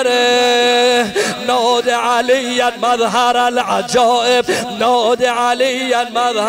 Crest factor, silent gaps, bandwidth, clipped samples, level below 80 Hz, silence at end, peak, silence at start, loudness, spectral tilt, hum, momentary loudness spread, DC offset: 10 dB; none; 16 kHz; under 0.1%; -56 dBFS; 0 s; -4 dBFS; 0 s; -14 LUFS; -2 dB/octave; none; 5 LU; under 0.1%